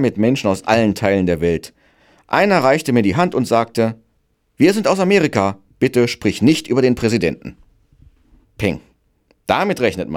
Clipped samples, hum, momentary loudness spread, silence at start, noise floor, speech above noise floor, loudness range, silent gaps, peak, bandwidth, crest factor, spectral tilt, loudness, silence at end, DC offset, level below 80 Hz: under 0.1%; none; 8 LU; 0 s; -64 dBFS; 48 dB; 4 LU; none; -2 dBFS; 16.5 kHz; 16 dB; -6 dB/octave; -17 LUFS; 0 s; under 0.1%; -48 dBFS